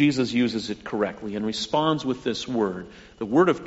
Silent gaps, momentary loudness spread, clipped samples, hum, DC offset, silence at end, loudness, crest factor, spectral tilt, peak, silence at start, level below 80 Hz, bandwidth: none; 9 LU; under 0.1%; none; under 0.1%; 0 s; -25 LUFS; 16 dB; -4.5 dB/octave; -8 dBFS; 0 s; -56 dBFS; 8 kHz